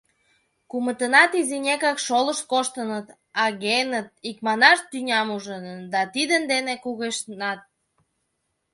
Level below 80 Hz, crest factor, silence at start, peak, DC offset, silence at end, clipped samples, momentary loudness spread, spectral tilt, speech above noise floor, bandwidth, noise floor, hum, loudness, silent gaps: -74 dBFS; 24 dB; 0.75 s; 0 dBFS; under 0.1%; 1.15 s; under 0.1%; 15 LU; -2 dB/octave; 52 dB; 11.5 kHz; -75 dBFS; none; -22 LUFS; none